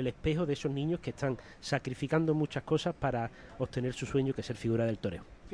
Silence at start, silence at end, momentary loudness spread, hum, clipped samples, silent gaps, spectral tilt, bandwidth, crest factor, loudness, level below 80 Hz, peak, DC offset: 0 s; 0 s; 7 LU; none; under 0.1%; none; -6.5 dB/octave; 10.5 kHz; 18 dB; -34 LUFS; -54 dBFS; -14 dBFS; under 0.1%